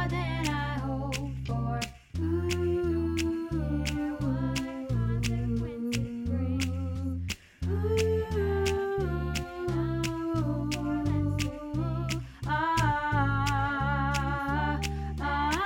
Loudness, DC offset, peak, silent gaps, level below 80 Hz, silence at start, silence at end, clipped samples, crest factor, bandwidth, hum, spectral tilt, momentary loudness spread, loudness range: -30 LUFS; under 0.1%; -14 dBFS; none; -40 dBFS; 0 s; 0 s; under 0.1%; 14 dB; 17 kHz; none; -6 dB/octave; 6 LU; 2 LU